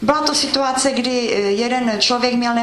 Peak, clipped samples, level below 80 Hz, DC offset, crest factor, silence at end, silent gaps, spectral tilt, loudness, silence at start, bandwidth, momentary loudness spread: 0 dBFS; under 0.1%; -50 dBFS; under 0.1%; 18 dB; 0 s; none; -2.5 dB/octave; -17 LUFS; 0 s; 12.5 kHz; 3 LU